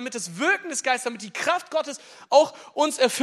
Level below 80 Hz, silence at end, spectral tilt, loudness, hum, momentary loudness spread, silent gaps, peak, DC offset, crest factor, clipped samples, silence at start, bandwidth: -84 dBFS; 0 s; -2 dB/octave; -24 LUFS; none; 11 LU; none; -4 dBFS; under 0.1%; 20 dB; under 0.1%; 0 s; 14.5 kHz